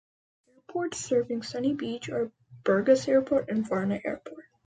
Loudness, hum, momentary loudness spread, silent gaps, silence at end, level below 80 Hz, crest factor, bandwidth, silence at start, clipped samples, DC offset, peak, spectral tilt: -28 LUFS; none; 13 LU; none; 0.25 s; -66 dBFS; 20 dB; 9.4 kHz; 0.7 s; under 0.1%; under 0.1%; -10 dBFS; -5.5 dB/octave